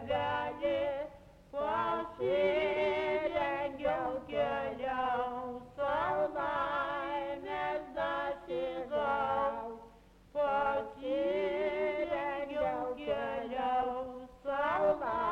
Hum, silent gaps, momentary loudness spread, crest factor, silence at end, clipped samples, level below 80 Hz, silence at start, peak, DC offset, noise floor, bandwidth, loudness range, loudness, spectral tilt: none; none; 7 LU; 16 dB; 0 s; under 0.1%; -60 dBFS; 0 s; -18 dBFS; under 0.1%; -58 dBFS; 7.4 kHz; 2 LU; -34 LUFS; -6 dB/octave